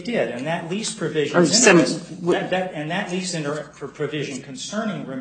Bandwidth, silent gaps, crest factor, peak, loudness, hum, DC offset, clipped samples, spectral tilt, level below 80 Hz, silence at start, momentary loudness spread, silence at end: 9.4 kHz; none; 22 dB; 0 dBFS; -21 LUFS; none; under 0.1%; under 0.1%; -3.5 dB/octave; -62 dBFS; 0 s; 15 LU; 0 s